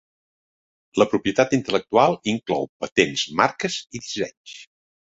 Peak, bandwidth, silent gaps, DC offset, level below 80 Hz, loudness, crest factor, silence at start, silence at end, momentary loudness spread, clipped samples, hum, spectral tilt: 0 dBFS; 8 kHz; 2.69-2.80 s, 2.92-2.96 s, 4.37-4.45 s; under 0.1%; -58 dBFS; -22 LUFS; 22 dB; 0.95 s; 0.4 s; 12 LU; under 0.1%; none; -4 dB/octave